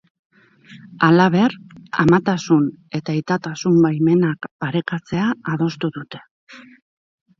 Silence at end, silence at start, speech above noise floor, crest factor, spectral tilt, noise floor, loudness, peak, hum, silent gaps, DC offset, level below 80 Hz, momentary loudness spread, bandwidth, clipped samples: 0.8 s; 0.7 s; 28 dB; 18 dB; -7 dB/octave; -46 dBFS; -19 LUFS; 0 dBFS; none; 4.51-4.59 s, 6.31-6.47 s; under 0.1%; -56 dBFS; 12 LU; 7.4 kHz; under 0.1%